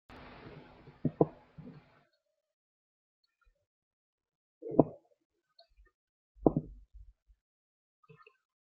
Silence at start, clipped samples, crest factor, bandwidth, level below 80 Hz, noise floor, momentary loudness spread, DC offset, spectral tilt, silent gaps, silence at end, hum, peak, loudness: 0.45 s; under 0.1%; 34 dB; 5.4 kHz; -60 dBFS; -71 dBFS; 24 LU; under 0.1%; -9.5 dB/octave; 2.53-3.23 s, 3.66-4.18 s, 4.35-4.61 s, 5.25-5.30 s, 5.94-6.35 s; 1.65 s; none; -4 dBFS; -33 LUFS